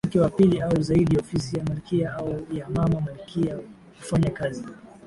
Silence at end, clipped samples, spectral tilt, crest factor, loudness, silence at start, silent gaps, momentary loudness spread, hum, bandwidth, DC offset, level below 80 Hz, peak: 0.2 s; under 0.1%; -7.5 dB/octave; 18 dB; -24 LUFS; 0.05 s; none; 11 LU; none; 11.5 kHz; under 0.1%; -46 dBFS; -6 dBFS